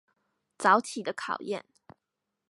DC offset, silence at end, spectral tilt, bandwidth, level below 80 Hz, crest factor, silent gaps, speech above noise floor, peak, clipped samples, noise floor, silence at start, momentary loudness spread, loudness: under 0.1%; 0.95 s; -3.5 dB/octave; 11.5 kHz; -82 dBFS; 24 dB; none; 57 dB; -8 dBFS; under 0.1%; -85 dBFS; 0.6 s; 13 LU; -28 LUFS